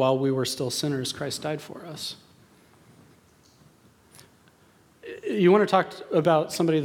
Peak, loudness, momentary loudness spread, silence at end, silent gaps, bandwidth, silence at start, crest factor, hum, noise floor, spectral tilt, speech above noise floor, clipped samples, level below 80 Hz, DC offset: -6 dBFS; -25 LUFS; 17 LU; 0 s; none; 17.5 kHz; 0 s; 20 dB; none; -59 dBFS; -5 dB/octave; 35 dB; under 0.1%; -68 dBFS; under 0.1%